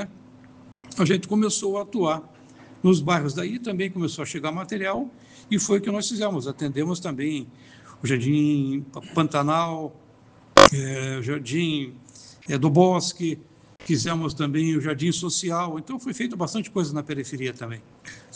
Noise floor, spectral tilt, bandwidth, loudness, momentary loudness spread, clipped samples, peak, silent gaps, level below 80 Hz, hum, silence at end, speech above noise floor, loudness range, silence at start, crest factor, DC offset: -52 dBFS; -5 dB/octave; 10.5 kHz; -24 LUFS; 13 LU; under 0.1%; 0 dBFS; none; -54 dBFS; none; 0.15 s; 28 dB; 6 LU; 0 s; 24 dB; under 0.1%